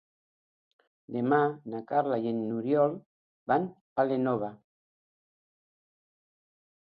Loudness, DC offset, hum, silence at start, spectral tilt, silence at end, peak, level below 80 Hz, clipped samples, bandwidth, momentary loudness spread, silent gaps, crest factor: -29 LUFS; under 0.1%; none; 1.1 s; -11 dB/octave; 2.35 s; -10 dBFS; -76 dBFS; under 0.1%; 5 kHz; 13 LU; 3.06-3.46 s, 3.81-3.96 s; 22 dB